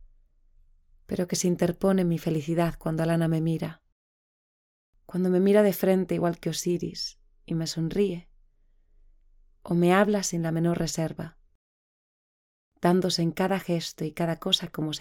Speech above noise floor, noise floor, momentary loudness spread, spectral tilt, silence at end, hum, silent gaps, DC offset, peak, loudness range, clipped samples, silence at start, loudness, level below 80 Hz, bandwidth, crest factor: 36 dB; -61 dBFS; 12 LU; -5.5 dB/octave; 0 s; none; 3.92-4.93 s, 11.55-12.72 s; under 0.1%; -6 dBFS; 3 LU; under 0.1%; 1.1 s; -26 LUFS; -54 dBFS; 18 kHz; 20 dB